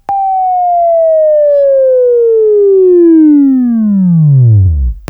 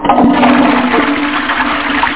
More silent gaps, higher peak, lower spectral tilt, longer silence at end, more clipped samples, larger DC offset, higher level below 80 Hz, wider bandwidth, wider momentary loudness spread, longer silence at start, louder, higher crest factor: neither; about the same, 0 dBFS vs 0 dBFS; first, -13 dB/octave vs -8.5 dB/octave; about the same, 0.1 s vs 0 s; neither; second, under 0.1% vs 2%; first, -24 dBFS vs -36 dBFS; second, 2.5 kHz vs 4 kHz; about the same, 5 LU vs 5 LU; about the same, 0.1 s vs 0 s; first, -7 LUFS vs -10 LUFS; about the same, 6 dB vs 10 dB